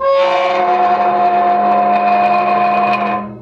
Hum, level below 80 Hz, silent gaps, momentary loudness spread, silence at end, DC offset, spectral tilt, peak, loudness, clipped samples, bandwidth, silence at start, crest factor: none; -56 dBFS; none; 2 LU; 0 s; under 0.1%; -6 dB/octave; -4 dBFS; -13 LUFS; under 0.1%; 6.8 kHz; 0 s; 10 dB